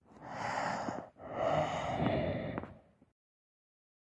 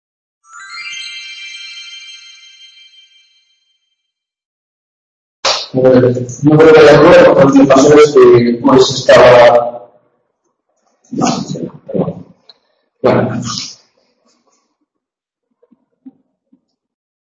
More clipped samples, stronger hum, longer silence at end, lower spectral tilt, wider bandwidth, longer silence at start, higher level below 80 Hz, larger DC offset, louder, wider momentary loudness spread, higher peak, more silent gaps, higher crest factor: second, under 0.1% vs 0.6%; neither; second, 1.3 s vs 3.5 s; about the same, -6 dB/octave vs -5.5 dB/octave; first, 10.5 kHz vs 8.8 kHz; second, 0.1 s vs 0.7 s; second, -60 dBFS vs -46 dBFS; neither; second, -36 LUFS vs -8 LUFS; second, 12 LU vs 22 LU; second, -20 dBFS vs 0 dBFS; second, none vs 4.45-5.43 s; first, 18 dB vs 12 dB